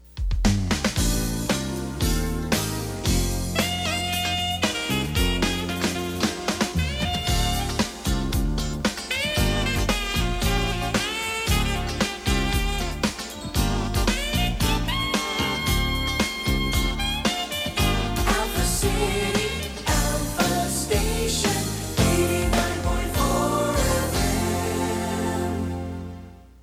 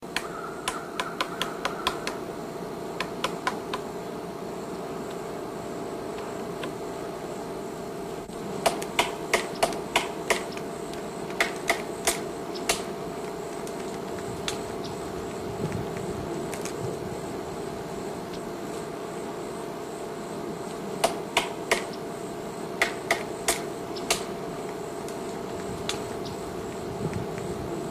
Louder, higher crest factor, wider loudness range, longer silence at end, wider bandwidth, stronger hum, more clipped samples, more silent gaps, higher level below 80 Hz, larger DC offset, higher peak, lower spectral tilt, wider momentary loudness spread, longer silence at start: first, -24 LUFS vs -31 LUFS; about the same, 18 dB vs 22 dB; second, 2 LU vs 6 LU; first, 0.15 s vs 0 s; about the same, 16 kHz vs 15.5 kHz; neither; neither; neither; first, -30 dBFS vs -54 dBFS; neither; first, -6 dBFS vs -10 dBFS; about the same, -4 dB/octave vs -3.5 dB/octave; second, 4 LU vs 8 LU; about the same, 0.05 s vs 0 s